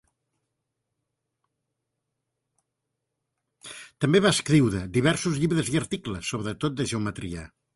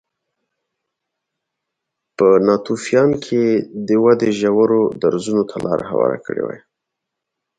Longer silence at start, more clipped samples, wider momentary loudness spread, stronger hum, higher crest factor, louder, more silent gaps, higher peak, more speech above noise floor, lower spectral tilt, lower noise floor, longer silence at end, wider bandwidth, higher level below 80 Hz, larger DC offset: first, 3.65 s vs 2.2 s; neither; first, 16 LU vs 9 LU; neither; about the same, 20 dB vs 18 dB; second, -25 LUFS vs -17 LUFS; neither; second, -8 dBFS vs 0 dBFS; second, 58 dB vs 64 dB; second, -5 dB/octave vs -6.5 dB/octave; about the same, -82 dBFS vs -80 dBFS; second, 0.3 s vs 1 s; first, 11.5 kHz vs 9.4 kHz; first, -52 dBFS vs -58 dBFS; neither